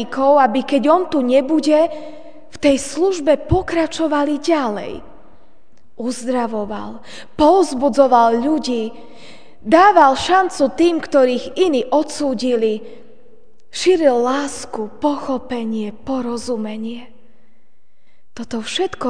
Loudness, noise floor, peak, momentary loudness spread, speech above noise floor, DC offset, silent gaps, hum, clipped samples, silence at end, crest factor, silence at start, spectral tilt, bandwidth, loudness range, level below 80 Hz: -17 LUFS; -63 dBFS; 0 dBFS; 15 LU; 47 dB; 2%; none; none; under 0.1%; 0 s; 18 dB; 0 s; -4.5 dB/octave; 10 kHz; 9 LU; -44 dBFS